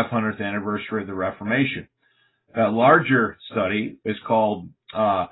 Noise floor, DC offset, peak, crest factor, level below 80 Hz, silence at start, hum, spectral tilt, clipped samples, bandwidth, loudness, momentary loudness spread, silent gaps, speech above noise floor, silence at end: -65 dBFS; under 0.1%; -2 dBFS; 20 dB; -56 dBFS; 0 s; none; -11 dB/octave; under 0.1%; 4.1 kHz; -22 LUFS; 13 LU; none; 43 dB; 0.05 s